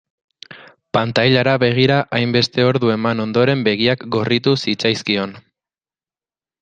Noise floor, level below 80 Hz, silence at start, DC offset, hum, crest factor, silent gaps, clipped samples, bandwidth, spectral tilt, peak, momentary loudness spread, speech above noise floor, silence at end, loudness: under -90 dBFS; -56 dBFS; 0.5 s; under 0.1%; none; 18 dB; none; under 0.1%; 9 kHz; -6 dB/octave; 0 dBFS; 6 LU; over 74 dB; 1.25 s; -16 LUFS